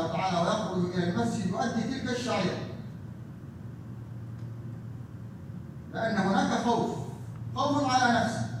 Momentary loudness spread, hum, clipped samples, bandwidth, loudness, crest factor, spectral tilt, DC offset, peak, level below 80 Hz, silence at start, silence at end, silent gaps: 17 LU; none; under 0.1%; 12.5 kHz; -29 LUFS; 18 dB; -5.5 dB/octave; under 0.1%; -12 dBFS; -60 dBFS; 0 s; 0 s; none